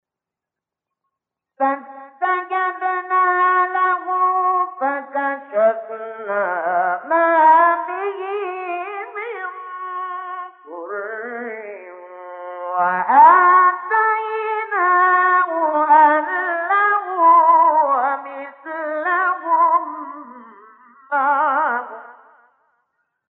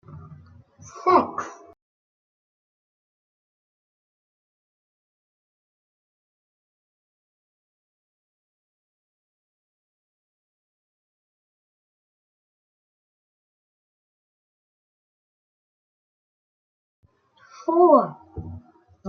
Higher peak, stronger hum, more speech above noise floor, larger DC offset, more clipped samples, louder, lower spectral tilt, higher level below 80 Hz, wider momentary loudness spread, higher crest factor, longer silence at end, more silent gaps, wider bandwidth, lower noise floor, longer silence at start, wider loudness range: about the same, -2 dBFS vs -4 dBFS; neither; first, 65 dB vs 39 dB; neither; neither; first, -17 LUFS vs -20 LUFS; about the same, -7 dB/octave vs -6.5 dB/octave; second, under -90 dBFS vs -66 dBFS; second, 19 LU vs 23 LU; second, 18 dB vs 26 dB; first, 1.2 s vs 0 s; second, none vs 1.82-17.03 s; second, 4 kHz vs 7 kHz; first, -86 dBFS vs -57 dBFS; first, 1.6 s vs 0.1 s; about the same, 13 LU vs 15 LU